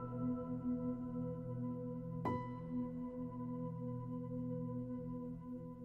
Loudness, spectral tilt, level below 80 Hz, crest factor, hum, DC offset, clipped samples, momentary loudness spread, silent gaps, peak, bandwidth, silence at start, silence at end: -44 LUFS; -11 dB/octave; -64 dBFS; 16 dB; none; under 0.1%; under 0.1%; 4 LU; none; -28 dBFS; 4.3 kHz; 0 s; 0 s